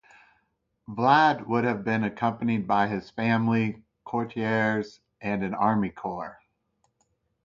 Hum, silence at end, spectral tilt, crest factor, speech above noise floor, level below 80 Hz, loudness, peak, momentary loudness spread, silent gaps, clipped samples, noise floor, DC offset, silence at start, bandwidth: none; 1.1 s; -7.5 dB/octave; 20 dB; 48 dB; -62 dBFS; -26 LUFS; -6 dBFS; 14 LU; none; under 0.1%; -74 dBFS; under 0.1%; 0.9 s; 7.4 kHz